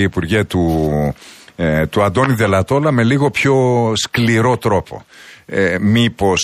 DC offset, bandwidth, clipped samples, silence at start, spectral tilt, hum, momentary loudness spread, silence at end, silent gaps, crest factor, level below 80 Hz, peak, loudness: under 0.1%; 15 kHz; under 0.1%; 0 s; -5.5 dB/octave; none; 8 LU; 0 s; none; 14 dB; -38 dBFS; -2 dBFS; -15 LUFS